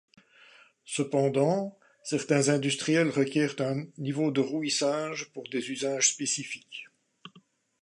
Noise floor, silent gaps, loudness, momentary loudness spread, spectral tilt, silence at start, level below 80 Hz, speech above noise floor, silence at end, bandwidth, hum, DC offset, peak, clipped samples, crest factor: -61 dBFS; none; -28 LUFS; 12 LU; -4 dB/octave; 0.85 s; -78 dBFS; 33 dB; 0.55 s; 11.5 kHz; none; under 0.1%; -10 dBFS; under 0.1%; 20 dB